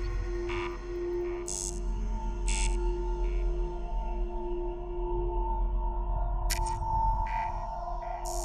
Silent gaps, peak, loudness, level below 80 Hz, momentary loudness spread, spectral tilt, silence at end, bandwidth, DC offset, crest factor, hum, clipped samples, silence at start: none; -16 dBFS; -34 LUFS; -32 dBFS; 6 LU; -5 dB/octave; 0 s; 14 kHz; under 0.1%; 16 dB; none; under 0.1%; 0 s